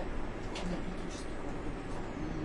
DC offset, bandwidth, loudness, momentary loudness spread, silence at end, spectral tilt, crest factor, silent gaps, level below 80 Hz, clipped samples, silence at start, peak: under 0.1%; 11 kHz; -41 LUFS; 3 LU; 0 s; -6 dB/octave; 12 dB; none; -42 dBFS; under 0.1%; 0 s; -26 dBFS